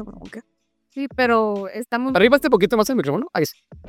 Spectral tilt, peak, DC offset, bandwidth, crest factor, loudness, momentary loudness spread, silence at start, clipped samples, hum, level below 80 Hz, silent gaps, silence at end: -5 dB/octave; 0 dBFS; under 0.1%; 17 kHz; 20 dB; -19 LUFS; 20 LU; 0 s; under 0.1%; none; -52 dBFS; none; 0 s